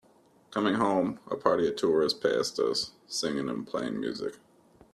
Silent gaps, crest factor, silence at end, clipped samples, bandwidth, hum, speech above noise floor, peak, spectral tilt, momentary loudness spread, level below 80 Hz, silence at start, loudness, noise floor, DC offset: none; 22 dB; 0.6 s; under 0.1%; 13 kHz; none; 33 dB; -8 dBFS; -4 dB/octave; 8 LU; -68 dBFS; 0.5 s; -29 LUFS; -62 dBFS; under 0.1%